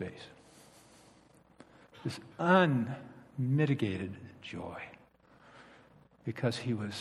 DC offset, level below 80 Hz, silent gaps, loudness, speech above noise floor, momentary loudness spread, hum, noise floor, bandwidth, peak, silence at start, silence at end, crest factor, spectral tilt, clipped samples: under 0.1%; -72 dBFS; none; -33 LUFS; 30 dB; 21 LU; none; -62 dBFS; 12.5 kHz; -12 dBFS; 0 s; 0 s; 24 dB; -7 dB/octave; under 0.1%